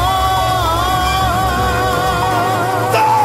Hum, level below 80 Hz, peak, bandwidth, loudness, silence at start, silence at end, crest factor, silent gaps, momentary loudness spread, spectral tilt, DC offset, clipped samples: none; -26 dBFS; -2 dBFS; 16.5 kHz; -15 LUFS; 0 s; 0 s; 12 dB; none; 1 LU; -4.5 dB/octave; under 0.1%; under 0.1%